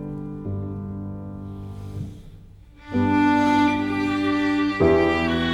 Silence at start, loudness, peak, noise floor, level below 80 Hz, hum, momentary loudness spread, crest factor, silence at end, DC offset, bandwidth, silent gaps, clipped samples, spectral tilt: 0 s; -22 LUFS; -6 dBFS; -45 dBFS; -44 dBFS; none; 17 LU; 18 dB; 0 s; under 0.1%; 10.5 kHz; none; under 0.1%; -7 dB/octave